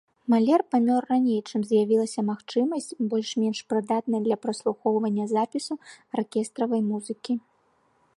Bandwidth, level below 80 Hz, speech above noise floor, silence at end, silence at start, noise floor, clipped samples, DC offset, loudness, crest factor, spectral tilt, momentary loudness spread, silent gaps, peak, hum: 11.5 kHz; -76 dBFS; 41 dB; 0.8 s; 0.3 s; -66 dBFS; under 0.1%; under 0.1%; -26 LUFS; 16 dB; -6 dB/octave; 9 LU; none; -10 dBFS; none